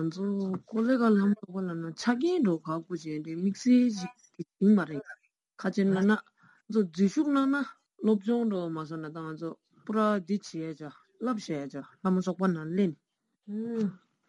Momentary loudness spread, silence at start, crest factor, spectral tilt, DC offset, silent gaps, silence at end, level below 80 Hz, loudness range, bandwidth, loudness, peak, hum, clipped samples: 15 LU; 0 s; 16 dB; -7 dB/octave; under 0.1%; none; 0.35 s; -78 dBFS; 5 LU; 10 kHz; -29 LUFS; -14 dBFS; none; under 0.1%